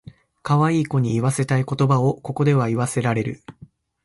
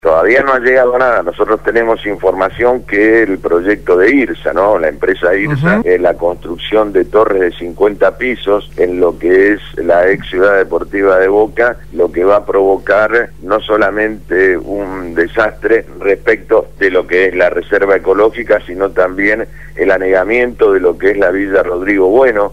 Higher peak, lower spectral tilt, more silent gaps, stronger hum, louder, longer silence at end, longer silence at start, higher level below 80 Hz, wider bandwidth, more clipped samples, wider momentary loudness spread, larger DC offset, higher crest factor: second, -8 dBFS vs 0 dBFS; about the same, -7 dB/octave vs -7 dB/octave; neither; neither; second, -21 LUFS vs -12 LUFS; first, 0.55 s vs 0 s; first, 0.45 s vs 0 s; second, -54 dBFS vs -36 dBFS; second, 11.5 kHz vs 13 kHz; neither; about the same, 6 LU vs 6 LU; second, under 0.1% vs 2%; about the same, 14 dB vs 10 dB